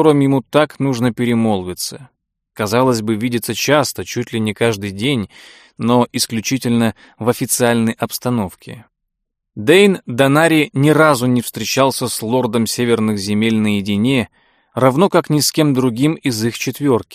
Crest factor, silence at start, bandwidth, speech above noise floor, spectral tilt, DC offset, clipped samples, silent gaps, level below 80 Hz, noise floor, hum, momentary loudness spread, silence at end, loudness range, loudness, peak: 16 dB; 0 s; 15.5 kHz; 60 dB; -5 dB/octave; under 0.1%; under 0.1%; none; -54 dBFS; -76 dBFS; none; 10 LU; 0 s; 4 LU; -16 LUFS; 0 dBFS